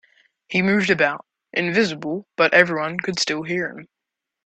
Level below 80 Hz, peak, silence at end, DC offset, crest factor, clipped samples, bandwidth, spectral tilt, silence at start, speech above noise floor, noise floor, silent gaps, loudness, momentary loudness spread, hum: -62 dBFS; 0 dBFS; 0.6 s; under 0.1%; 22 dB; under 0.1%; 9 kHz; -4.5 dB/octave; 0.5 s; 63 dB; -84 dBFS; none; -20 LUFS; 12 LU; none